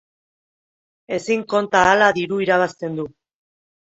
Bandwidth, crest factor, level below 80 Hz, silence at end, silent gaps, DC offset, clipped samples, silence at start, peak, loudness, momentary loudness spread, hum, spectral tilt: 8.2 kHz; 20 dB; -56 dBFS; 0.9 s; none; under 0.1%; under 0.1%; 1.1 s; 0 dBFS; -18 LUFS; 14 LU; none; -4.5 dB/octave